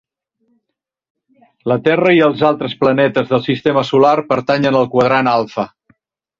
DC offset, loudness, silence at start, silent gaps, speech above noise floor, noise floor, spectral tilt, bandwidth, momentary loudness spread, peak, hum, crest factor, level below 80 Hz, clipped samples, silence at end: under 0.1%; -14 LUFS; 1.65 s; none; 64 dB; -78 dBFS; -7 dB/octave; 7.4 kHz; 7 LU; -2 dBFS; none; 14 dB; -56 dBFS; under 0.1%; 0.75 s